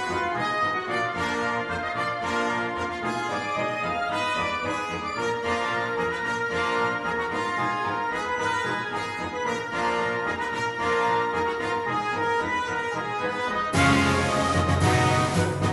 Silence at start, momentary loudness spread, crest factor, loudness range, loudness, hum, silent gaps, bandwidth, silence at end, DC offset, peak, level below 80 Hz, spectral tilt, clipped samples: 0 s; 6 LU; 18 dB; 4 LU; -25 LUFS; none; none; 11.5 kHz; 0 s; under 0.1%; -8 dBFS; -50 dBFS; -5 dB/octave; under 0.1%